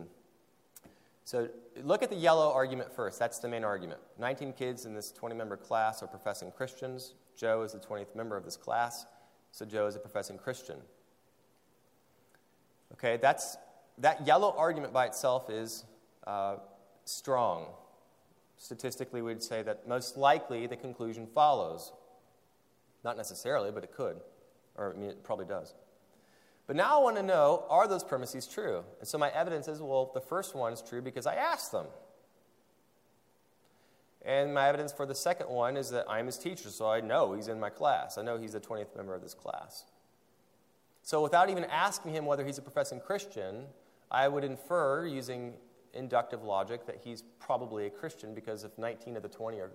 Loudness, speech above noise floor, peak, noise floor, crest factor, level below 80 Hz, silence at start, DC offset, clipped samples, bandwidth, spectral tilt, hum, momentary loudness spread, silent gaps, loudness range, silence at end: -33 LUFS; 37 dB; -12 dBFS; -70 dBFS; 22 dB; -82 dBFS; 0 s; under 0.1%; under 0.1%; 16 kHz; -4 dB/octave; none; 17 LU; none; 9 LU; 0 s